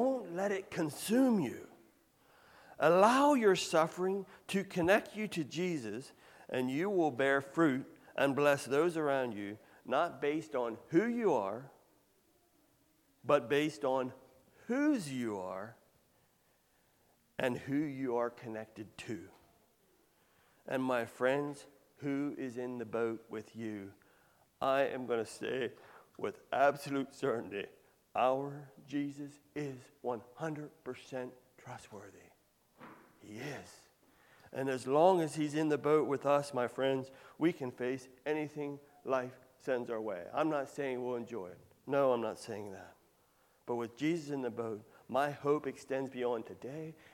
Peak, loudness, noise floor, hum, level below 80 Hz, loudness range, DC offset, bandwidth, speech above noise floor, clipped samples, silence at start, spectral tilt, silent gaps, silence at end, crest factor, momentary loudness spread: -12 dBFS; -35 LUFS; -72 dBFS; none; -78 dBFS; 10 LU; under 0.1%; 17.5 kHz; 38 dB; under 0.1%; 0 s; -5.5 dB/octave; none; 0.2 s; 24 dB; 16 LU